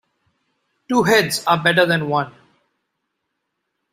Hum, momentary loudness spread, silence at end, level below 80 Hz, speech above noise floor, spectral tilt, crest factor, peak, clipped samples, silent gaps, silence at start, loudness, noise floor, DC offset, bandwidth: none; 8 LU; 1.65 s; -60 dBFS; 59 dB; -4.5 dB/octave; 20 dB; -2 dBFS; under 0.1%; none; 0.9 s; -17 LUFS; -76 dBFS; under 0.1%; 16 kHz